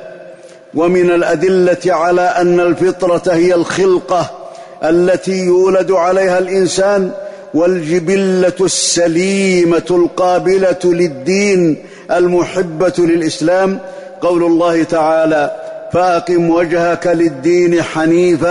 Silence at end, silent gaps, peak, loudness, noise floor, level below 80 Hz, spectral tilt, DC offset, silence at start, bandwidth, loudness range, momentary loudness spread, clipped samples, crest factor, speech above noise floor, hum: 0 s; none; -2 dBFS; -12 LUFS; -35 dBFS; -48 dBFS; -5 dB/octave; under 0.1%; 0 s; 11 kHz; 2 LU; 6 LU; under 0.1%; 10 dB; 24 dB; none